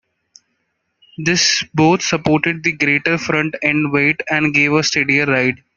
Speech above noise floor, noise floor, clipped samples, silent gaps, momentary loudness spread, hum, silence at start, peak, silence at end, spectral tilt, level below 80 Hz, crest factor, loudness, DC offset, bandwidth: 54 dB; -70 dBFS; under 0.1%; none; 4 LU; none; 1.2 s; 0 dBFS; 0.2 s; -4 dB/octave; -54 dBFS; 16 dB; -15 LUFS; under 0.1%; 7.4 kHz